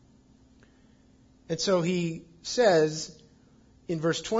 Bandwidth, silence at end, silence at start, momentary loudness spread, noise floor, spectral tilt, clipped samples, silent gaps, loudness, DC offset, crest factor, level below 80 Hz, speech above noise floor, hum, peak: 7.8 kHz; 0 s; 1.5 s; 16 LU; -59 dBFS; -4.5 dB/octave; under 0.1%; none; -27 LUFS; under 0.1%; 18 dB; -64 dBFS; 33 dB; none; -10 dBFS